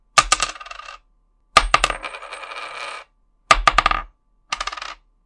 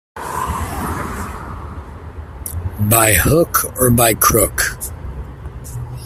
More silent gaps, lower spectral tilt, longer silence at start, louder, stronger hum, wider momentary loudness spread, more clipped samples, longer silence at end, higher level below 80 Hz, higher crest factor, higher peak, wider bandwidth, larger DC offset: neither; second, -0.5 dB/octave vs -4 dB/octave; about the same, 0.15 s vs 0.15 s; second, -19 LUFS vs -15 LUFS; neither; about the same, 20 LU vs 21 LU; neither; first, 0.3 s vs 0 s; about the same, -34 dBFS vs -32 dBFS; about the same, 22 dB vs 18 dB; about the same, 0 dBFS vs 0 dBFS; second, 12 kHz vs 16.5 kHz; neither